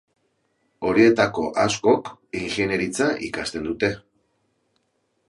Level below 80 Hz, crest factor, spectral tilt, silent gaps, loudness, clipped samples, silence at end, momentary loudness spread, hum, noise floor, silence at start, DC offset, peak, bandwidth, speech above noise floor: -54 dBFS; 20 dB; -4.5 dB/octave; none; -22 LUFS; under 0.1%; 1.3 s; 12 LU; none; -71 dBFS; 0.8 s; under 0.1%; -2 dBFS; 11.5 kHz; 50 dB